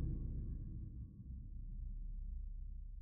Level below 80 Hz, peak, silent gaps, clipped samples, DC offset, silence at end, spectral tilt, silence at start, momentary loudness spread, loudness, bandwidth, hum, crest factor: -46 dBFS; -32 dBFS; none; under 0.1%; under 0.1%; 0 s; -15.5 dB/octave; 0 s; 7 LU; -50 LUFS; 1.2 kHz; none; 14 dB